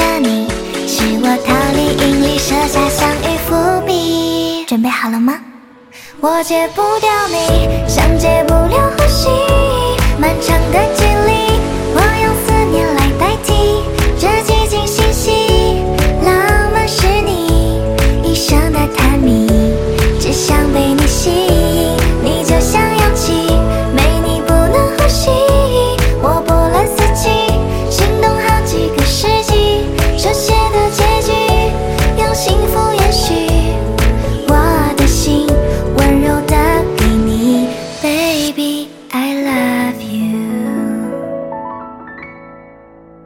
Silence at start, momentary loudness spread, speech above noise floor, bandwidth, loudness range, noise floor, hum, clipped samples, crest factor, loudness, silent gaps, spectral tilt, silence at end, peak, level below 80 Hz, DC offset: 0 s; 5 LU; 27 dB; 17 kHz; 3 LU; -39 dBFS; none; under 0.1%; 12 dB; -13 LUFS; none; -5 dB/octave; 0.65 s; 0 dBFS; -18 dBFS; under 0.1%